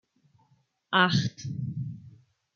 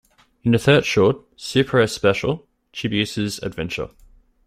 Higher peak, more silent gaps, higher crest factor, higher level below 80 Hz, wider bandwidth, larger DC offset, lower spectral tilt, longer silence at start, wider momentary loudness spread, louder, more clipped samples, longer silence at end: second, -8 dBFS vs -2 dBFS; neither; about the same, 22 dB vs 18 dB; second, -66 dBFS vs -48 dBFS; second, 7.4 kHz vs 15 kHz; neither; about the same, -5 dB/octave vs -5.5 dB/octave; first, 0.9 s vs 0.45 s; first, 16 LU vs 13 LU; second, -28 LUFS vs -20 LUFS; neither; second, 0.45 s vs 0.6 s